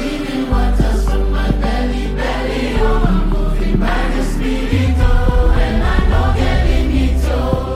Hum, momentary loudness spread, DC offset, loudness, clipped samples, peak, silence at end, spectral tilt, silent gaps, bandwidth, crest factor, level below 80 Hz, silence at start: none; 4 LU; under 0.1%; -17 LUFS; under 0.1%; -2 dBFS; 0 s; -7 dB/octave; none; 12 kHz; 12 dB; -16 dBFS; 0 s